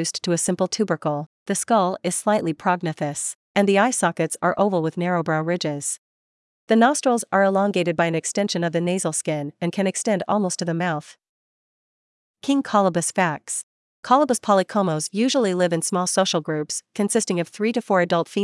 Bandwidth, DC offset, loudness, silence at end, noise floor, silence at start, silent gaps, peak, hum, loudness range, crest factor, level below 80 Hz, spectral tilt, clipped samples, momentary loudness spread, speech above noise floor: 12 kHz; under 0.1%; -22 LUFS; 0 s; under -90 dBFS; 0 s; 1.26-1.46 s, 3.35-3.55 s, 5.99-6.68 s, 11.29-12.34 s, 13.63-14.03 s; -4 dBFS; none; 4 LU; 18 dB; -72 dBFS; -4.5 dB/octave; under 0.1%; 8 LU; over 69 dB